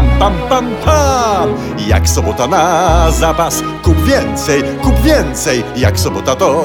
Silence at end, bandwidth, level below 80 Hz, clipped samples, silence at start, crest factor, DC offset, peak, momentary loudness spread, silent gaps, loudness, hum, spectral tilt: 0 s; 20 kHz; -20 dBFS; under 0.1%; 0 s; 12 dB; under 0.1%; 0 dBFS; 4 LU; none; -12 LUFS; none; -5 dB/octave